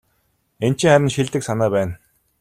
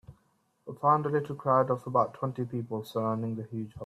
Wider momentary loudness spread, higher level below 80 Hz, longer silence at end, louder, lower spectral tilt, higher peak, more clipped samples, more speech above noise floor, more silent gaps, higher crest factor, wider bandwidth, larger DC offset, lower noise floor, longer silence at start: about the same, 11 LU vs 11 LU; first, -50 dBFS vs -68 dBFS; first, 0.45 s vs 0 s; first, -19 LUFS vs -30 LUFS; second, -5.5 dB/octave vs -8.5 dB/octave; first, -2 dBFS vs -12 dBFS; neither; first, 49 dB vs 42 dB; neither; about the same, 18 dB vs 18 dB; about the same, 15 kHz vs 14.5 kHz; neither; second, -66 dBFS vs -71 dBFS; first, 0.6 s vs 0.1 s